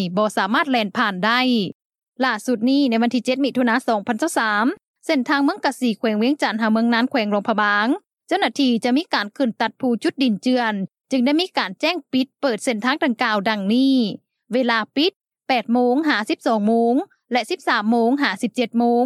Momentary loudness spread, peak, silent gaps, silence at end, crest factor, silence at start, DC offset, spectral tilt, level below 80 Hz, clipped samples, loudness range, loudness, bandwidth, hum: 5 LU; -2 dBFS; 1.75-1.90 s, 2.08-2.12 s, 4.88-4.94 s, 15.16-15.20 s; 0 s; 16 dB; 0 s; under 0.1%; -4.5 dB/octave; -78 dBFS; under 0.1%; 1 LU; -20 LUFS; 13.5 kHz; none